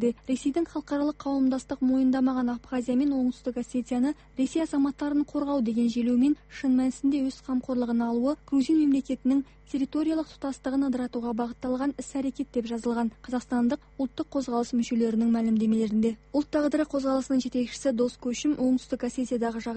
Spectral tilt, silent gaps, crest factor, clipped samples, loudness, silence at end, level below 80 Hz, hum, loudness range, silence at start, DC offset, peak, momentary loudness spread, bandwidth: -5.5 dB/octave; none; 12 dB; under 0.1%; -27 LUFS; 0 s; -56 dBFS; none; 4 LU; 0 s; under 0.1%; -14 dBFS; 7 LU; 8.8 kHz